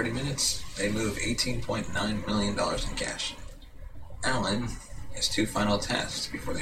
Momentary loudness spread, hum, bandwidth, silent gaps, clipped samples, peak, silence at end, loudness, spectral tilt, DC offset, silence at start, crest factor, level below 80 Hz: 16 LU; none; 16 kHz; none; under 0.1%; -12 dBFS; 0 s; -29 LUFS; -3.5 dB/octave; under 0.1%; 0 s; 18 dB; -42 dBFS